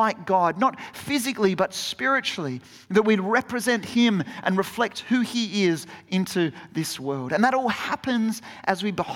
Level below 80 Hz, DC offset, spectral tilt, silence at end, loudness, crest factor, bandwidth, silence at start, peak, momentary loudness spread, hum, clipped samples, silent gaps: -66 dBFS; under 0.1%; -4.5 dB/octave; 0 s; -24 LUFS; 18 dB; 17 kHz; 0 s; -6 dBFS; 8 LU; none; under 0.1%; none